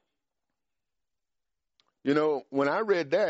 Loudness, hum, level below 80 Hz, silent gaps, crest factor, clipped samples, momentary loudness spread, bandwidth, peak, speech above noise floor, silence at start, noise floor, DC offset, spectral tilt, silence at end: -28 LUFS; none; -78 dBFS; none; 18 dB; under 0.1%; 3 LU; 8 kHz; -12 dBFS; 63 dB; 2.05 s; -89 dBFS; under 0.1%; -4 dB/octave; 0 s